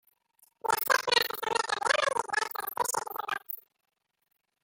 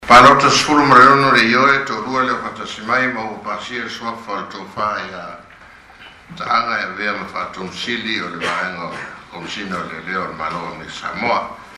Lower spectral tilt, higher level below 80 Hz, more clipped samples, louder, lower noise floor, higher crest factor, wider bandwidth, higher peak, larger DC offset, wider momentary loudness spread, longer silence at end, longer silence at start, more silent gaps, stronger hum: second, 0 dB/octave vs -3.5 dB/octave; second, -76 dBFS vs -50 dBFS; neither; second, -29 LUFS vs -16 LUFS; first, -68 dBFS vs -42 dBFS; first, 22 dB vs 16 dB; first, 17 kHz vs 13.5 kHz; second, -10 dBFS vs 0 dBFS; neither; second, 10 LU vs 19 LU; first, 1.05 s vs 0 s; first, 0.65 s vs 0 s; neither; neither